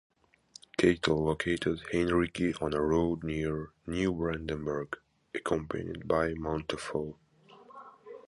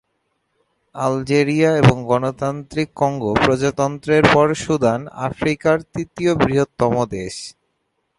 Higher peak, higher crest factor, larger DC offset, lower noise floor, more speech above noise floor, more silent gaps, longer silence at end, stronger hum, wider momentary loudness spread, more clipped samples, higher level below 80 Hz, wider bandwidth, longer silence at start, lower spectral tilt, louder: second, -10 dBFS vs 0 dBFS; about the same, 22 dB vs 18 dB; neither; second, -58 dBFS vs -71 dBFS; second, 27 dB vs 53 dB; neither; second, 0.05 s vs 0.7 s; neither; about the same, 13 LU vs 11 LU; neither; second, -50 dBFS vs -44 dBFS; about the same, 11.5 kHz vs 11.5 kHz; second, 0.8 s vs 0.95 s; about the same, -6 dB/octave vs -6 dB/octave; second, -32 LUFS vs -18 LUFS